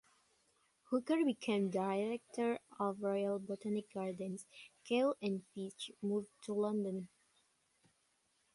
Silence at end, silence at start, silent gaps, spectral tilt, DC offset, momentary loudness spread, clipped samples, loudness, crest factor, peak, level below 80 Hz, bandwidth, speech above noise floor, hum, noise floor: 1.5 s; 0.9 s; none; -6 dB/octave; under 0.1%; 11 LU; under 0.1%; -39 LUFS; 18 dB; -22 dBFS; -84 dBFS; 11.5 kHz; 40 dB; none; -78 dBFS